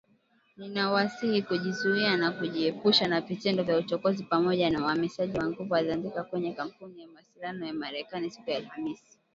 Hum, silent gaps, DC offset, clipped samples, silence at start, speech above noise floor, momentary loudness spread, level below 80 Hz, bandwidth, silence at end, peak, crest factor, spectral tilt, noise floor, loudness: none; none; under 0.1%; under 0.1%; 0.6 s; 38 dB; 12 LU; -64 dBFS; 7.8 kHz; 0.4 s; -10 dBFS; 20 dB; -5.5 dB/octave; -67 dBFS; -29 LUFS